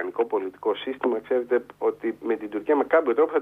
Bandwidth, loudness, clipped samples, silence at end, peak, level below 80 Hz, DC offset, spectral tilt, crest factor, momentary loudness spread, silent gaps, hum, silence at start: 3.9 kHz; -25 LUFS; under 0.1%; 0 s; -8 dBFS; -70 dBFS; under 0.1%; -6.5 dB/octave; 16 dB; 7 LU; none; 50 Hz at -65 dBFS; 0 s